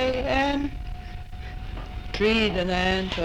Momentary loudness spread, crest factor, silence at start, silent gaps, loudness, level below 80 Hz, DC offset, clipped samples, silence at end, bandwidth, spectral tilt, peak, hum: 17 LU; 18 dB; 0 s; none; -24 LUFS; -36 dBFS; under 0.1%; under 0.1%; 0 s; 15.5 kHz; -5.5 dB/octave; -8 dBFS; none